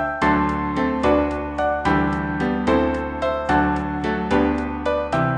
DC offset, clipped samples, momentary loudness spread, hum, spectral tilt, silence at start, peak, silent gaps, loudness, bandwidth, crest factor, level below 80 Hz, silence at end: under 0.1%; under 0.1%; 5 LU; none; -7.5 dB/octave; 0 s; -6 dBFS; none; -21 LUFS; 10 kHz; 14 dB; -34 dBFS; 0 s